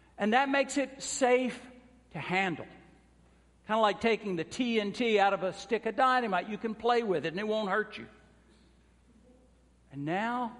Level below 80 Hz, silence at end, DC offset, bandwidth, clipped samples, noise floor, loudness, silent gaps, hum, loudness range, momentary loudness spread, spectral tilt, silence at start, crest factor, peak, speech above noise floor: -66 dBFS; 0 s; under 0.1%; 11.5 kHz; under 0.1%; -63 dBFS; -30 LUFS; none; none; 5 LU; 14 LU; -4 dB/octave; 0.2 s; 20 dB; -10 dBFS; 33 dB